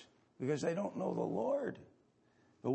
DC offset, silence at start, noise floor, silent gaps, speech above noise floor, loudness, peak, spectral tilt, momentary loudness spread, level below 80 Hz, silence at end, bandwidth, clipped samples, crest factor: under 0.1%; 0 s; -71 dBFS; none; 34 dB; -38 LUFS; -24 dBFS; -7 dB/octave; 8 LU; -82 dBFS; 0 s; 8.4 kHz; under 0.1%; 16 dB